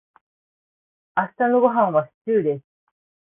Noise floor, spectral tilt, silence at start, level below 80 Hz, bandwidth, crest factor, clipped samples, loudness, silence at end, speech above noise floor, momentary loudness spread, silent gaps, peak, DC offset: under -90 dBFS; -11.5 dB/octave; 1.15 s; -70 dBFS; 3.7 kHz; 18 dB; under 0.1%; -21 LUFS; 0.65 s; over 70 dB; 9 LU; 2.14-2.25 s; -6 dBFS; under 0.1%